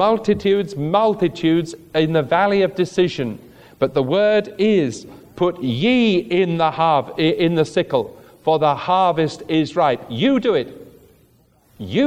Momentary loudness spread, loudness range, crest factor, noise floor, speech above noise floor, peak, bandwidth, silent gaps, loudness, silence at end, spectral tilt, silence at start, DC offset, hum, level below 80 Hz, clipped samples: 7 LU; 1 LU; 16 dB; -56 dBFS; 38 dB; -2 dBFS; 14.5 kHz; none; -18 LUFS; 0 s; -6.5 dB/octave; 0 s; under 0.1%; none; -54 dBFS; under 0.1%